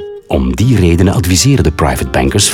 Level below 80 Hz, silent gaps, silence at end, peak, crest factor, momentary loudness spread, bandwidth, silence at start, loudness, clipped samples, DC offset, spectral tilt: -24 dBFS; none; 0 s; 0 dBFS; 10 dB; 6 LU; 17 kHz; 0 s; -11 LUFS; under 0.1%; under 0.1%; -5 dB/octave